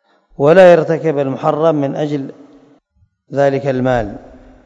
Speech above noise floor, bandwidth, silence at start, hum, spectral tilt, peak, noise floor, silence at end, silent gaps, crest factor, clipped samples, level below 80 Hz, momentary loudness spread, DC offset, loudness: 46 dB; 7.8 kHz; 0.4 s; none; -7.5 dB/octave; 0 dBFS; -58 dBFS; 0.45 s; none; 14 dB; 0.6%; -44 dBFS; 16 LU; under 0.1%; -13 LUFS